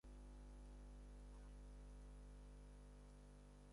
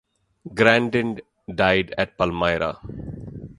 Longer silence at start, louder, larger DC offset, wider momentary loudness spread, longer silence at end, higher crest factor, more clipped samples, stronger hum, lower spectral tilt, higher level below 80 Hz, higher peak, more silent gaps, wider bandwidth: second, 0.05 s vs 0.45 s; second, -63 LUFS vs -21 LUFS; neither; second, 3 LU vs 18 LU; about the same, 0 s vs 0.05 s; second, 8 dB vs 24 dB; neither; first, 50 Hz at -60 dBFS vs none; about the same, -6 dB/octave vs -6 dB/octave; second, -60 dBFS vs -46 dBFS; second, -50 dBFS vs 0 dBFS; neither; about the same, 11 kHz vs 11.5 kHz